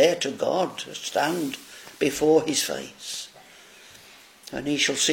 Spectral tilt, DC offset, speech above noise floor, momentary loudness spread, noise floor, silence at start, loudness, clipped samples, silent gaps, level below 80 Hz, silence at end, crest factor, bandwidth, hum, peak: -2.5 dB/octave; under 0.1%; 25 dB; 21 LU; -50 dBFS; 0 s; -25 LUFS; under 0.1%; none; -62 dBFS; 0 s; 20 dB; 17 kHz; none; -4 dBFS